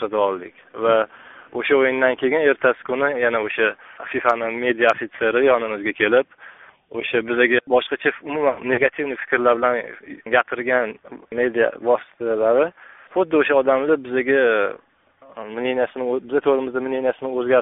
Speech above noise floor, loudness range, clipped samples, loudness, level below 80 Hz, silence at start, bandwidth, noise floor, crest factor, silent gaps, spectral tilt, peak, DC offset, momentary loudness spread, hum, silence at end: 31 dB; 2 LU; under 0.1%; -20 LUFS; -64 dBFS; 0 s; 4 kHz; -50 dBFS; 18 dB; none; -2 dB/octave; -2 dBFS; under 0.1%; 10 LU; none; 0 s